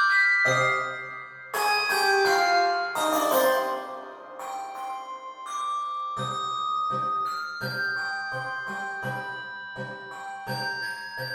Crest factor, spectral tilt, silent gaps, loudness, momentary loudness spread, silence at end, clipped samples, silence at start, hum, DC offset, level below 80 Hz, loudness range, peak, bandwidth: 16 dB; -3 dB/octave; none; -26 LUFS; 15 LU; 0 s; under 0.1%; 0 s; none; under 0.1%; -72 dBFS; 8 LU; -10 dBFS; 17.5 kHz